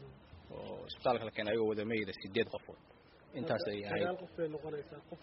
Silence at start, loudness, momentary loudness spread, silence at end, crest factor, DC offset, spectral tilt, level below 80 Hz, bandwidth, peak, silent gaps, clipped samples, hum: 0 s; -38 LUFS; 17 LU; 0 s; 20 dB; under 0.1%; -4 dB/octave; -68 dBFS; 5.8 kHz; -20 dBFS; none; under 0.1%; none